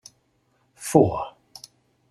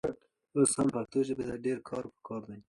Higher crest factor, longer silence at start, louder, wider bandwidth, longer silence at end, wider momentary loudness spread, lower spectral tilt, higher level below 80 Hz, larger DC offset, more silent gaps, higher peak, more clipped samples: first, 26 dB vs 18 dB; first, 0.8 s vs 0.05 s; first, -21 LUFS vs -32 LUFS; first, 13.5 kHz vs 11.5 kHz; first, 0.8 s vs 0.1 s; first, 25 LU vs 15 LU; first, -6.5 dB/octave vs -5 dB/octave; first, -56 dBFS vs -64 dBFS; neither; neither; first, 0 dBFS vs -14 dBFS; neither